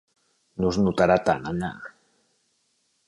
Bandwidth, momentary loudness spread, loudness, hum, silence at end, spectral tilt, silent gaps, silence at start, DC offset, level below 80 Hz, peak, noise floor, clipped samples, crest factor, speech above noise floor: 11.5 kHz; 22 LU; -24 LUFS; none; 1.2 s; -6.5 dB/octave; none; 0.6 s; under 0.1%; -50 dBFS; -6 dBFS; -70 dBFS; under 0.1%; 20 dB; 47 dB